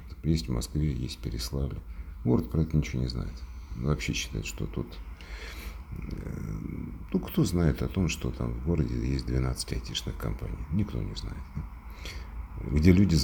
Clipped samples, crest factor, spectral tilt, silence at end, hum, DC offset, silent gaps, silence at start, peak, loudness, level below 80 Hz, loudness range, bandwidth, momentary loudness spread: under 0.1%; 24 dB; -6 dB/octave; 0 s; none; under 0.1%; none; 0 s; -6 dBFS; -31 LUFS; -36 dBFS; 6 LU; over 20 kHz; 14 LU